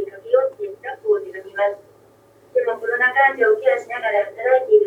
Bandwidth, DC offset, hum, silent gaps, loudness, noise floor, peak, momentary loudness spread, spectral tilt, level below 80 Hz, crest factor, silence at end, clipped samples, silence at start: 7.8 kHz; under 0.1%; none; none; -19 LUFS; -52 dBFS; -4 dBFS; 13 LU; -4 dB/octave; -74 dBFS; 16 dB; 0 s; under 0.1%; 0 s